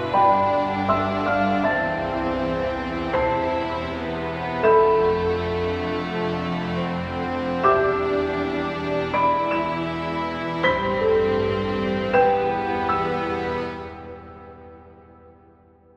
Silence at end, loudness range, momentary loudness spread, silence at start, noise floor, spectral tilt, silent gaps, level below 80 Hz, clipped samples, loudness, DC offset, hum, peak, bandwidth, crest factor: 0.65 s; 2 LU; 9 LU; 0 s; -53 dBFS; -7 dB/octave; none; -44 dBFS; under 0.1%; -22 LUFS; under 0.1%; none; -6 dBFS; 8.2 kHz; 18 dB